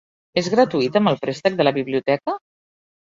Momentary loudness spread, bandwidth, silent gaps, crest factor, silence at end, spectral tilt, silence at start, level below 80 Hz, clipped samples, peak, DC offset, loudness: 7 LU; 7.8 kHz; none; 18 dB; 0.7 s; -6 dB/octave; 0.35 s; -62 dBFS; under 0.1%; -2 dBFS; under 0.1%; -20 LUFS